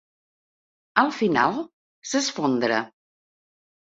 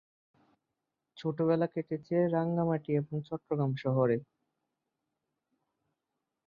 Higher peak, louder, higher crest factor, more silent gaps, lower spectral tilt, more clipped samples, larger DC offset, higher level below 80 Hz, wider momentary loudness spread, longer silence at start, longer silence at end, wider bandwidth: first, -2 dBFS vs -16 dBFS; first, -23 LUFS vs -32 LUFS; first, 26 dB vs 18 dB; first, 1.73-2.02 s vs none; second, -3.5 dB/octave vs -10 dB/octave; neither; neither; first, -68 dBFS vs -74 dBFS; first, 17 LU vs 8 LU; second, 0.95 s vs 1.15 s; second, 1.1 s vs 2.25 s; first, 8 kHz vs 6.8 kHz